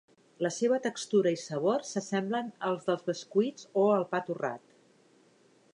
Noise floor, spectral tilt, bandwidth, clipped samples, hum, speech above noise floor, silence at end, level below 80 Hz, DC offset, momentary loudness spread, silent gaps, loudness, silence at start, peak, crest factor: -64 dBFS; -5 dB/octave; 10.5 kHz; under 0.1%; none; 34 dB; 1.15 s; -84 dBFS; under 0.1%; 8 LU; none; -31 LUFS; 0.4 s; -14 dBFS; 18 dB